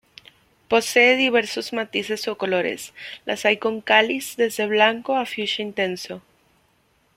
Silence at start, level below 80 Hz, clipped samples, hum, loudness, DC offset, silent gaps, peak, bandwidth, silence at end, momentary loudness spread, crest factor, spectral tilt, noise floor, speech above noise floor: 0.7 s; -66 dBFS; under 0.1%; none; -21 LUFS; under 0.1%; none; -2 dBFS; 16.5 kHz; 1 s; 14 LU; 20 dB; -3 dB/octave; -63 dBFS; 42 dB